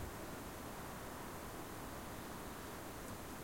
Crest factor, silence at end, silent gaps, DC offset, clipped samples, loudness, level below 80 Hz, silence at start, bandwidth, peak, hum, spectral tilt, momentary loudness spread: 14 dB; 0 s; none; under 0.1%; under 0.1%; -49 LUFS; -58 dBFS; 0 s; 16.5 kHz; -34 dBFS; none; -4 dB/octave; 0 LU